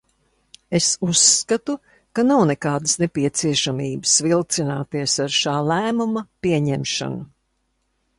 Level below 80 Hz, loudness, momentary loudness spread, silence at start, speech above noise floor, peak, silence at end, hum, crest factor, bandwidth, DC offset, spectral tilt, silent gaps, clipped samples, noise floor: -56 dBFS; -19 LUFS; 10 LU; 0.7 s; 50 dB; -2 dBFS; 0.95 s; none; 20 dB; 11.5 kHz; under 0.1%; -3.5 dB/octave; none; under 0.1%; -70 dBFS